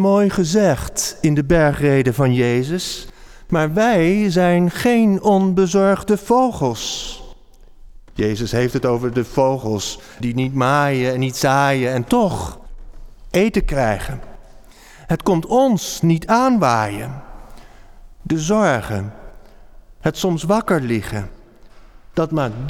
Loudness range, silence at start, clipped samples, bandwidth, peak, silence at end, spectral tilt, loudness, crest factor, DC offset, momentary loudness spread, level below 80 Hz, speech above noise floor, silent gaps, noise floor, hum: 6 LU; 0 s; under 0.1%; 18 kHz; -4 dBFS; 0 s; -6 dB/octave; -18 LUFS; 14 dB; under 0.1%; 12 LU; -36 dBFS; 26 dB; none; -42 dBFS; none